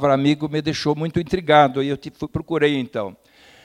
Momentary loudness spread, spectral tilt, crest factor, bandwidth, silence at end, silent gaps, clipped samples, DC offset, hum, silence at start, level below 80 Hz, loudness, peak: 14 LU; -6.5 dB/octave; 18 dB; 11.5 kHz; 0.5 s; none; under 0.1%; under 0.1%; none; 0 s; -48 dBFS; -20 LUFS; -2 dBFS